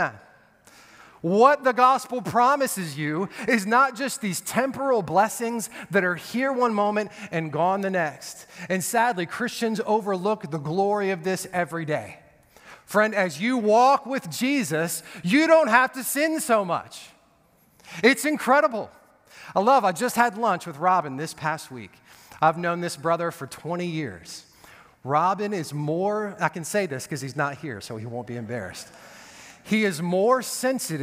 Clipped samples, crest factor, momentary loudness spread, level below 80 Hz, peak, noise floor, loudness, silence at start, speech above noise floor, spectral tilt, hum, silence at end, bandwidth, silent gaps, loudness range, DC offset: under 0.1%; 22 dB; 14 LU; -70 dBFS; -2 dBFS; -61 dBFS; -24 LUFS; 0 s; 37 dB; -4.5 dB/octave; none; 0 s; 16 kHz; none; 7 LU; under 0.1%